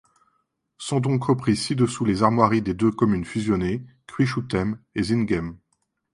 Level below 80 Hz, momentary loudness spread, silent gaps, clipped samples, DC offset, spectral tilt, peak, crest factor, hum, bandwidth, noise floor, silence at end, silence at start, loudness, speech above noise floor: -48 dBFS; 8 LU; none; under 0.1%; under 0.1%; -6.5 dB/octave; -2 dBFS; 20 dB; none; 11.5 kHz; -72 dBFS; 0.6 s; 0.8 s; -23 LUFS; 50 dB